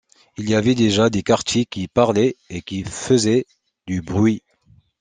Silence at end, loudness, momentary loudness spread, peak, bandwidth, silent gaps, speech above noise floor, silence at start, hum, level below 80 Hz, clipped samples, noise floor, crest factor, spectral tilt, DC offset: 0.6 s; -19 LUFS; 13 LU; -2 dBFS; 9.8 kHz; none; 37 dB; 0.4 s; none; -52 dBFS; under 0.1%; -55 dBFS; 18 dB; -5.5 dB/octave; under 0.1%